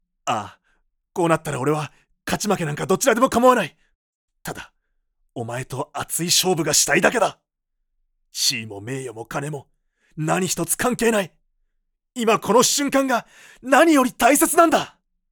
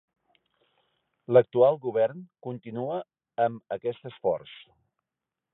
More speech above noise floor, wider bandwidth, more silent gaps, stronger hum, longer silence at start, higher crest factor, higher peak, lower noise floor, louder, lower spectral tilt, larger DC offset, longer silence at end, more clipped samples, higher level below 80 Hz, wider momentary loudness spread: second, 56 dB vs 62 dB; first, over 20 kHz vs 4 kHz; first, 3.95-4.28 s vs none; neither; second, 0.25 s vs 1.3 s; about the same, 20 dB vs 22 dB; first, -2 dBFS vs -8 dBFS; second, -76 dBFS vs -88 dBFS; first, -20 LUFS vs -27 LUFS; second, -3 dB/octave vs -10.5 dB/octave; neither; second, 0.45 s vs 1 s; neither; first, -54 dBFS vs -74 dBFS; about the same, 18 LU vs 17 LU